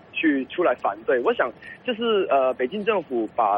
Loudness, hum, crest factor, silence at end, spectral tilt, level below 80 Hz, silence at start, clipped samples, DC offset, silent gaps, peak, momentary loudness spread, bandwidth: -23 LUFS; none; 14 dB; 0 s; -7 dB/octave; -64 dBFS; 0.15 s; under 0.1%; under 0.1%; none; -8 dBFS; 6 LU; 5.2 kHz